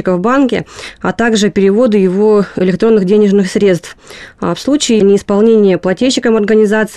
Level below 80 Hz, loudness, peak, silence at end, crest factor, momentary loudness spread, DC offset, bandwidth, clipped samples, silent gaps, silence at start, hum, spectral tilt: -44 dBFS; -11 LUFS; 0 dBFS; 0 s; 10 dB; 10 LU; under 0.1%; 12.5 kHz; under 0.1%; none; 0 s; none; -5.5 dB/octave